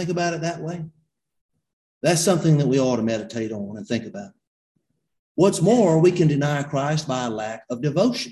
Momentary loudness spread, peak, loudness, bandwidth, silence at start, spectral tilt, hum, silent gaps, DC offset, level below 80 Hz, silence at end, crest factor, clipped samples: 15 LU; -4 dBFS; -21 LUFS; 12.5 kHz; 0 s; -6 dB/octave; none; 1.41-1.49 s, 1.73-2.01 s, 4.47-4.75 s, 5.19-5.35 s; under 0.1%; -58 dBFS; 0 s; 18 dB; under 0.1%